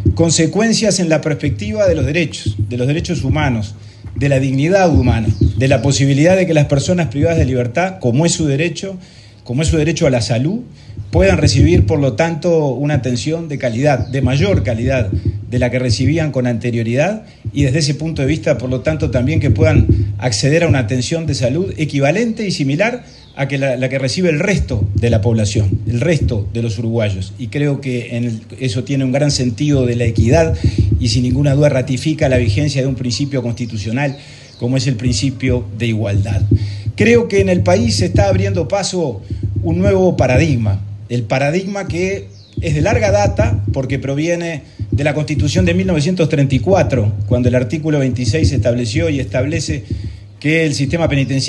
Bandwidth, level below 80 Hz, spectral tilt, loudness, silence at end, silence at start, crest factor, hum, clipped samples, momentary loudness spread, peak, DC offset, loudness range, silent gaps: 11.5 kHz; -30 dBFS; -6 dB/octave; -15 LUFS; 0 s; 0 s; 14 dB; none; under 0.1%; 8 LU; 0 dBFS; under 0.1%; 3 LU; none